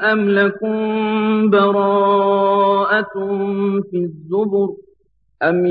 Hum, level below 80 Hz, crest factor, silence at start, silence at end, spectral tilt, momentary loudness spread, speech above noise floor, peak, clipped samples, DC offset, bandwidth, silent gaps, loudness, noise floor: none; -64 dBFS; 14 dB; 0 s; 0 s; -9.5 dB/octave; 7 LU; 45 dB; -4 dBFS; under 0.1%; under 0.1%; 4.9 kHz; none; -17 LUFS; -61 dBFS